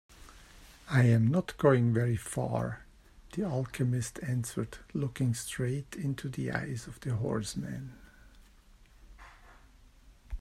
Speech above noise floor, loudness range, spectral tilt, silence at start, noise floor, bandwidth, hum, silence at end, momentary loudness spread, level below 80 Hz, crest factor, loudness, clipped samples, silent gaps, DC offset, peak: 28 dB; 10 LU; -6.5 dB/octave; 0.1 s; -58 dBFS; 14 kHz; none; 0 s; 14 LU; -54 dBFS; 20 dB; -32 LUFS; under 0.1%; none; under 0.1%; -12 dBFS